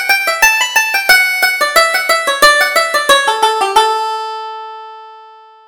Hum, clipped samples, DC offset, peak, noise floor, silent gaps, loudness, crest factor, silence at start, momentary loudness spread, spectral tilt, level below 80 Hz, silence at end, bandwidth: none; 0.1%; under 0.1%; 0 dBFS; -39 dBFS; none; -10 LUFS; 12 dB; 0 s; 15 LU; 1.5 dB/octave; -48 dBFS; 0.4 s; over 20 kHz